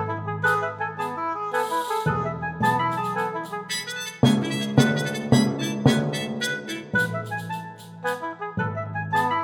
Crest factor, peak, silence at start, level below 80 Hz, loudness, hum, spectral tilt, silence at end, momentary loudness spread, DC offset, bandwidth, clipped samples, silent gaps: 20 dB; -4 dBFS; 0 s; -54 dBFS; -25 LUFS; none; -5 dB/octave; 0 s; 10 LU; under 0.1%; 17.5 kHz; under 0.1%; none